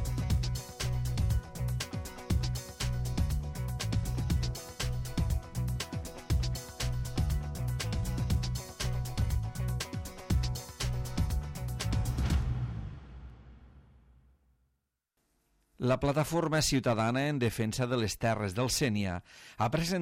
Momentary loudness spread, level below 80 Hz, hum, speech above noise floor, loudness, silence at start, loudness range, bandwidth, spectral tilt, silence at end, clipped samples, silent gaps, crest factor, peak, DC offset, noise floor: 8 LU; -38 dBFS; none; 51 dB; -33 LUFS; 0 s; 7 LU; 16.5 kHz; -5 dB/octave; 0 s; under 0.1%; none; 16 dB; -16 dBFS; under 0.1%; -81 dBFS